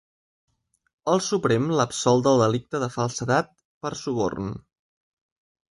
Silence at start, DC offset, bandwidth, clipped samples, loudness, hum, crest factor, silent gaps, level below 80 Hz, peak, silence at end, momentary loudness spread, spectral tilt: 1.05 s; under 0.1%; 11.5 kHz; under 0.1%; -24 LUFS; none; 20 dB; 3.65-3.81 s; -58 dBFS; -6 dBFS; 1.1 s; 14 LU; -5 dB/octave